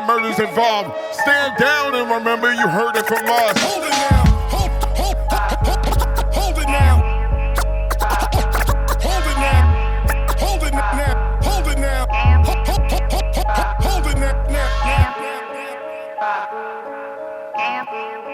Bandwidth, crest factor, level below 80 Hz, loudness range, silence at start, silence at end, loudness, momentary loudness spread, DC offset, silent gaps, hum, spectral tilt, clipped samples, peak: 18 kHz; 16 dB; -20 dBFS; 5 LU; 0 s; 0 s; -18 LUFS; 11 LU; under 0.1%; none; none; -5 dB/octave; under 0.1%; -2 dBFS